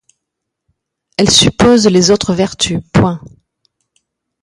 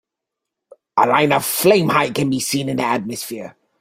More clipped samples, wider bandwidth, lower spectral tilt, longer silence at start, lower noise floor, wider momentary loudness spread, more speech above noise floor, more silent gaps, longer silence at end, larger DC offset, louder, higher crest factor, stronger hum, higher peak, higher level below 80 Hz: neither; about the same, 16 kHz vs 16 kHz; about the same, -4 dB/octave vs -4 dB/octave; first, 1.2 s vs 0.95 s; second, -77 dBFS vs -82 dBFS; second, 9 LU vs 13 LU; about the same, 66 dB vs 64 dB; neither; first, 1.15 s vs 0.3 s; neither; first, -11 LUFS vs -17 LUFS; about the same, 14 dB vs 18 dB; neither; about the same, 0 dBFS vs -2 dBFS; first, -38 dBFS vs -58 dBFS